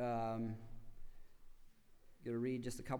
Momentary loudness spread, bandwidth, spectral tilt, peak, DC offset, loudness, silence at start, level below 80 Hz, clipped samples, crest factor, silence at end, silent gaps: 17 LU; over 20 kHz; -6.5 dB/octave; -28 dBFS; under 0.1%; -43 LUFS; 0 s; -58 dBFS; under 0.1%; 16 dB; 0 s; none